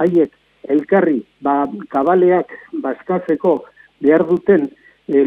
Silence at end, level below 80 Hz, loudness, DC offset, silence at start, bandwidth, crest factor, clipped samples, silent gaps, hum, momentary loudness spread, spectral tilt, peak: 0 s; -60 dBFS; -17 LUFS; under 0.1%; 0 s; 3.9 kHz; 16 dB; under 0.1%; none; none; 10 LU; -9.5 dB/octave; 0 dBFS